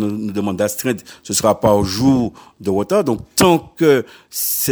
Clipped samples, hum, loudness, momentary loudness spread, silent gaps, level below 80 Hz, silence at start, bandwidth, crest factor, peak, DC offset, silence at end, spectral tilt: under 0.1%; none; -17 LUFS; 8 LU; none; -44 dBFS; 0 s; over 20 kHz; 16 dB; 0 dBFS; under 0.1%; 0 s; -4.5 dB/octave